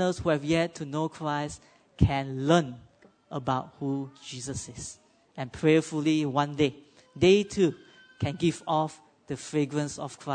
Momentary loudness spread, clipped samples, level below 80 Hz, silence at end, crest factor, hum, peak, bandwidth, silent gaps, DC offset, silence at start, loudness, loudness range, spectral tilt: 15 LU; under 0.1%; -48 dBFS; 0 s; 22 dB; none; -6 dBFS; 9.6 kHz; none; under 0.1%; 0 s; -28 LUFS; 5 LU; -6 dB/octave